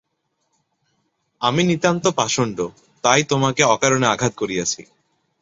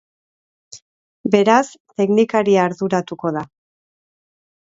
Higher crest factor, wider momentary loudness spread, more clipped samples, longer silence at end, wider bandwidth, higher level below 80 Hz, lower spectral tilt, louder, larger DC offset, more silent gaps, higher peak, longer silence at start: about the same, 20 dB vs 20 dB; second, 8 LU vs 14 LU; neither; second, 0.6 s vs 1.3 s; about the same, 8 kHz vs 8 kHz; first, -56 dBFS vs -64 dBFS; second, -3.5 dB/octave vs -6 dB/octave; about the same, -19 LUFS vs -18 LUFS; neither; second, none vs 0.82-1.24 s, 1.80-1.85 s; about the same, 0 dBFS vs 0 dBFS; first, 1.4 s vs 0.75 s